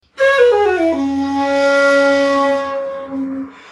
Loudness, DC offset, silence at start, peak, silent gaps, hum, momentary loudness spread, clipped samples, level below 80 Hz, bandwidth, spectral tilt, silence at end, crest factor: -14 LUFS; under 0.1%; 0.2 s; -2 dBFS; none; none; 12 LU; under 0.1%; -56 dBFS; 10.5 kHz; -4 dB/octave; 0.2 s; 14 dB